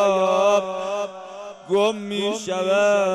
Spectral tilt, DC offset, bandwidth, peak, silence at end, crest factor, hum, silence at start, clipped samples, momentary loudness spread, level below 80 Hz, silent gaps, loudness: -4 dB/octave; under 0.1%; 12 kHz; -8 dBFS; 0 s; 14 dB; none; 0 s; under 0.1%; 15 LU; -70 dBFS; none; -21 LUFS